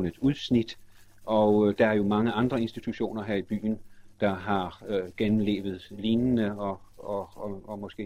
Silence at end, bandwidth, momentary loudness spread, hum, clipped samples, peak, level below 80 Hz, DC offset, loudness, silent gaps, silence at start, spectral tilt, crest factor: 0 s; 10.5 kHz; 14 LU; none; under 0.1%; -10 dBFS; -54 dBFS; under 0.1%; -28 LUFS; none; 0 s; -7.5 dB/octave; 18 dB